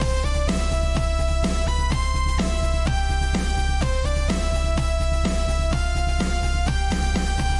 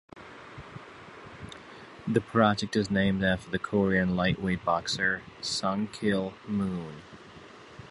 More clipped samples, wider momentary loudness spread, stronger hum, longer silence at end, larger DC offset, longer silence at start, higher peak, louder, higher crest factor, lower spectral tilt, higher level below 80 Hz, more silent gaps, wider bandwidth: neither; second, 0 LU vs 22 LU; neither; about the same, 0 s vs 0 s; neither; second, 0 s vs 0.15 s; about the same, -10 dBFS vs -8 dBFS; first, -23 LUFS vs -28 LUFS; second, 10 dB vs 22 dB; about the same, -5 dB/octave vs -5.5 dB/octave; first, -22 dBFS vs -52 dBFS; neither; about the same, 11.5 kHz vs 11.5 kHz